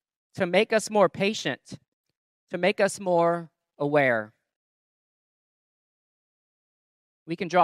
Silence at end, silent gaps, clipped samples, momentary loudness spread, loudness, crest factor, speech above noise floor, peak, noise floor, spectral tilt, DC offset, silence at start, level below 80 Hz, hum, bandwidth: 0 s; 1.88-2.04 s, 2.17-2.47 s, 4.56-7.26 s; under 0.1%; 15 LU; -25 LUFS; 20 dB; over 66 dB; -6 dBFS; under -90 dBFS; -4.5 dB/octave; under 0.1%; 0.35 s; -74 dBFS; none; 13.5 kHz